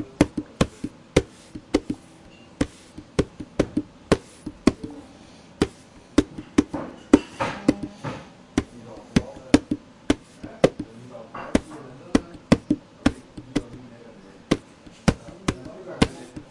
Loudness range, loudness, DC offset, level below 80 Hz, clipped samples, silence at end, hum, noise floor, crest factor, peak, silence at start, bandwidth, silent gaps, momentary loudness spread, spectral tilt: 4 LU; -26 LUFS; under 0.1%; -42 dBFS; under 0.1%; 0.1 s; none; -48 dBFS; 26 dB; 0 dBFS; 0 s; 11.5 kHz; none; 19 LU; -6 dB/octave